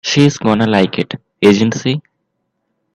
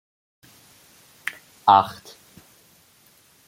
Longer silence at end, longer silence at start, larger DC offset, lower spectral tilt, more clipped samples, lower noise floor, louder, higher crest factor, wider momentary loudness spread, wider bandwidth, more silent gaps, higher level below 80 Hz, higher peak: second, 0.95 s vs 1.55 s; second, 0.05 s vs 1.65 s; neither; first, -5.5 dB/octave vs -4 dB/octave; neither; first, -69 dBFS vs -57 dBFS; first, -14 LUFS vs -21 LUFS; second, 14 dB vs 24 dB; second, 10 LU vs 17 LU; second, 11 kHz vs 16.5 kHz; neither; first, -52 dBFS vs -70 dBFS; about the same, 0 dBFS vs -2 dBFS